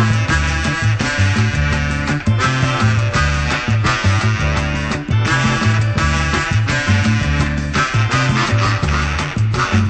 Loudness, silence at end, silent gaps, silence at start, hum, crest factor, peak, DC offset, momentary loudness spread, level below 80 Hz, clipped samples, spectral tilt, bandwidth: -16 LUFS; 0 s; none; 0 s; none; 12 dB; -4 dBFS; 0.1%; 3 LU; -26 dBFS; under 0.1%; -5 dB/octave; 9 kHz